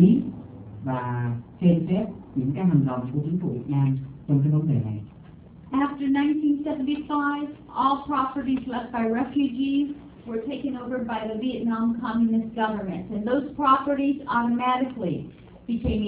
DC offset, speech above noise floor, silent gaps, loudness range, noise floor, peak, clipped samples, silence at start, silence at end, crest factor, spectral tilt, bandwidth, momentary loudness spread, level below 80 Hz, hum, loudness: under 0.1%; 21 dB; none; 3 LU; -46 dBFS; -6 dBFS; under 0.1%; 0 s; 0 s; 18 dB; -12 dB/octave; 4 kHz; 10 LU; -48 dBFS; none; -25 LUFS